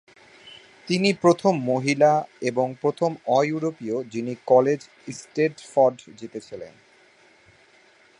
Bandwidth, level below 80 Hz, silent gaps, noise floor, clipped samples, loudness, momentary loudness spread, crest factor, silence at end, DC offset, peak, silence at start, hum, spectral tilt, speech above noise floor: 11 kHz; -70 dBFS; none; -56 dBFS; under 0.1%; -23 LUFS; 19 LU; 20 dB; 1.5 s; under 0.1%; -4 dBFS; 0.45 s; none; -6 dB/octave; 33 dB